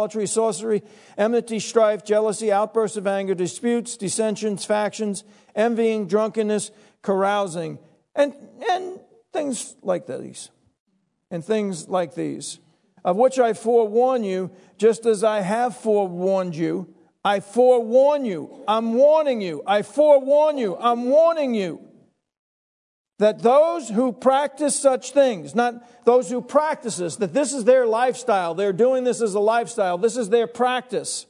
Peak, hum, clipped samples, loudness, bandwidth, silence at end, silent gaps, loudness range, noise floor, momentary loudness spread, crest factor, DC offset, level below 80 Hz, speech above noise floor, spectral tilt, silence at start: -2 dBFS; none; under 0.1%; -21 LUFS; 11 kHz; 0.05 s; 10.80-10.86 s, 22.39-23.05 s; 8 LU; -56 dBFS; 11 LU; 18 dB; under 0.1%; -80 dBFS; 36 dB; -4.5 dB/octave; 0 s